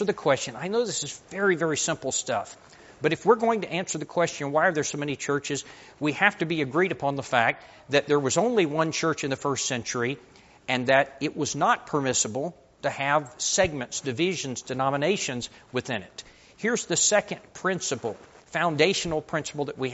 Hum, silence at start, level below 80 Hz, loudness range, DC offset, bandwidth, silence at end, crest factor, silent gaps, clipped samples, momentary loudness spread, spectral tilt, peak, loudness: none; 0 s; -60 dBFS; 2 LU; under 0.1%; 8 kHz; 0 s; 22 dB; none; under 0.1%; 10 LU; -3 dB/octave; -4 dBFS; -26 LUFS